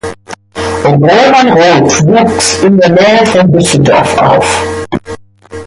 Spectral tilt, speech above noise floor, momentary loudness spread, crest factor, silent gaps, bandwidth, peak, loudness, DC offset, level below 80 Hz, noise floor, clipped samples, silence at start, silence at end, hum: -5 dB/octave; 21 dB; 14 LU; 8 dB; none; 11.5 kHz; 0 dBFS; -7 LUFS; under 0.1%; -34 dBFS; -27 dBFS; under 0.1%; 0.05 s; 0 s; none